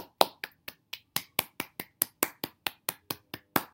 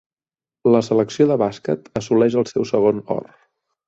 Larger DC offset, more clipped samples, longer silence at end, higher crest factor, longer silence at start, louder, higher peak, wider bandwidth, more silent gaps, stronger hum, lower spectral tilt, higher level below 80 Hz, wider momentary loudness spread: neither; neither; second, 0.05 s vs 0.65 s; first, 34 dB vs 16 dB; second, 0 s vs 0.65 s; second, -33 LUFS vs -19 LUFS; about the same, 0 dBFS vs -2 dBFS; first, 17 kHz vs 8 kHz; neither; neither; second, -1.5 dB/octave vs -7 dB/octave; second, -70 dBFS vs -58 dBFS; first, 13 LU vs 8 LU